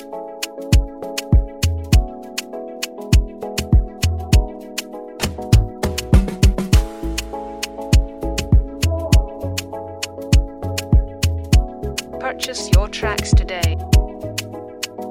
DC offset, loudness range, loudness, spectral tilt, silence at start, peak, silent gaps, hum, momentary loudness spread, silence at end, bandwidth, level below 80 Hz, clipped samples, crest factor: under 0.1%; 2 LU; -20 LUFS; -5 dB/octave; 0 s; 0 dBFS; none; none; 11 LU; 0 s; 16.5 kHz; -20 dBFS; under 0.1%; 18 dB